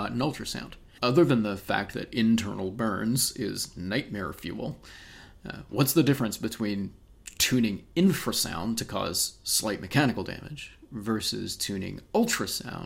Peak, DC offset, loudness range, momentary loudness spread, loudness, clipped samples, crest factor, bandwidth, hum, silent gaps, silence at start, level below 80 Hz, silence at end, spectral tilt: -8 dBFS; under 0.1%; 3 LU; 15 LU; -28 LUFS; under 0.1%; 20 dB; 16 kHz; none; none; 0 s; -54 dBFS; 0 s; -4 dB/octave